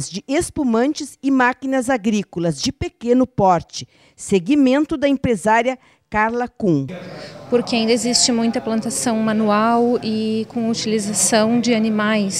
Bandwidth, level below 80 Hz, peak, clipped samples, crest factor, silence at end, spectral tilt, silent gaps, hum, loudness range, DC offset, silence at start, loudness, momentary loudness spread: 15 kHz; -48 dBFS; -2 dBFS; under 0.1%; 16 dB; 0 s; -4 dB/octave; none; none; 2 LU; under 0.1%; 0 s; -18 LUFS; 8 LU